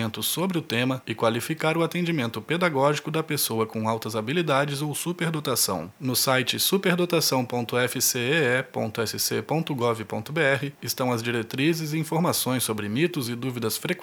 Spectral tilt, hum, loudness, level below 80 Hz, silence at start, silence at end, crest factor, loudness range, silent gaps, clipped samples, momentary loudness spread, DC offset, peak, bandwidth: -4 dB/octave; none; -25 LUFS; -70 dBFS; 0 s; 0 s; 20 dB; 3 LU; none; under 0.1%; 6 LU; under 0.1%; -4 dBFS; over 20 kHz